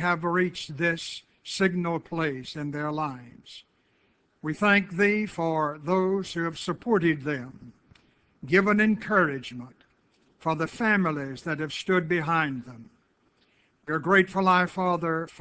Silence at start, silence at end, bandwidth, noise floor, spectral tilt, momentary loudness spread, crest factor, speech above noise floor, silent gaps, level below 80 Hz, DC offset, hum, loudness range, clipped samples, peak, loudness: 0 s; 0.1 s; 8 kHz; -67 dBFS; -6 dB/octave; 15 LU; 20 dB; 41 dB; none; -64 dBFS; under 0.1%; none; 4 LU; under 0.1%; -6 dBFS; -26 LUFS